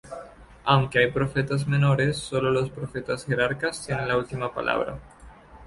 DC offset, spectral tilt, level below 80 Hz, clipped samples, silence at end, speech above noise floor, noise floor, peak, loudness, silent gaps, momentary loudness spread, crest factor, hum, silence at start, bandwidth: under 0.1%; -6 dB/octave; -50 dBFS; under 0.1%; 0 s; 23 dB; -48 dBFS; -4 dBFS; -25 LUFS; none; 11 LU; 20 dB; none; 0.05 s; 11.5 kHz